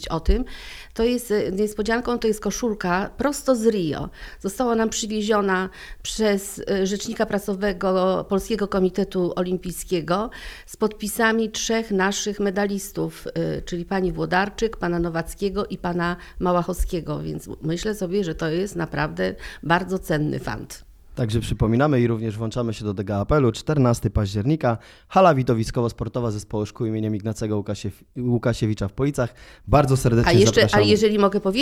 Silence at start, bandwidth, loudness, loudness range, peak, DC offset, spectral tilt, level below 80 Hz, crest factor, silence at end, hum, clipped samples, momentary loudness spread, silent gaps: 0 s; 16.5 kHz; -23 LUFS; 5 LU; -2 dBFS; under 0.1%; -5.5 dB/octave; -38 dBFS; 20 dB; 0 s; none; under 0.1%; 11 LU; none